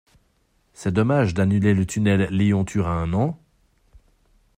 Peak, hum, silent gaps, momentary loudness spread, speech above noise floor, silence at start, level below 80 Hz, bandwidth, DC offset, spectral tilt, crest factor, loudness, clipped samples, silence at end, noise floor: -6 dBFS; none; none; 6 LU; 45 dB; 0.8 s; -48 dBFS; 14.5 kHz; under 0.1%; -7 dB/octave; 16 dB; -21 LUFS; under 0.1%; 1.2 s; -65 dBFS